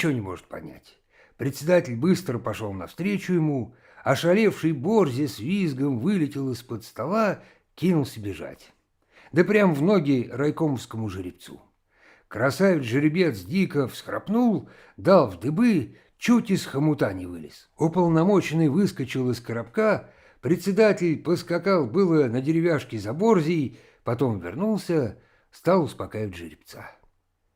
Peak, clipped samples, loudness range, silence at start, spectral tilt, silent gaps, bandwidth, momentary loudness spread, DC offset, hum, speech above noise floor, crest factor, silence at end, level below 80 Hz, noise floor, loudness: -6 dBFS; under 0.1%; 4 LU; 0 s; -7 dB/octave; none; 16.5 kHz; 14 LU; under 0.1%; none; 43 dB; 18 dB; 0.65 s; -62 dBFS; -66 dBFS; -24 LUFS